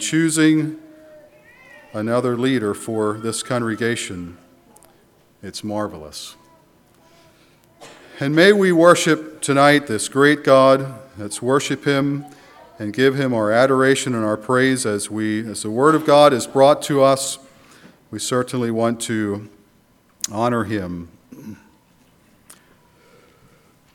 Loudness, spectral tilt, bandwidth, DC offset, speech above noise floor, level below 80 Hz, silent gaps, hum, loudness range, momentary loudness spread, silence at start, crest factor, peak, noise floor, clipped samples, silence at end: -18 LUFS; -4.5 dB/octave; 17 kHz; under 0.1%; 39 dB; -62 dBFS; none; none; 13 LU; 19 LU; 0 s; 20 dB; 0 dBFS; -56 dBFS; under 0.1%; 2.4 s